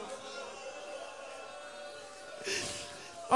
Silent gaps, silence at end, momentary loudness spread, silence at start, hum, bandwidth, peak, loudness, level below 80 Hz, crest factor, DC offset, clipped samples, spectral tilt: none; 0 s; 11 LU; 0 s; none; 11.5 kHz; -12 dBFS; -41 LUFS; -72 dBFS; 26 dB; under 0.1%; under 0.1%; -1.5 dB/octave